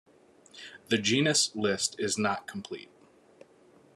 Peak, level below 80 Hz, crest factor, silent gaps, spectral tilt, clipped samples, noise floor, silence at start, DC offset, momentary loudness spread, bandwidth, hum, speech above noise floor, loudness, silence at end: -12 dBFS; -74 dBFS; 20 dB; none; -3 dB/octave; under 0.1%; -60 dBFS; 0.55 s; under 0.1%; 21 LU; 13 kHz; none; 30 dB; -28 LUFS; 1.15 s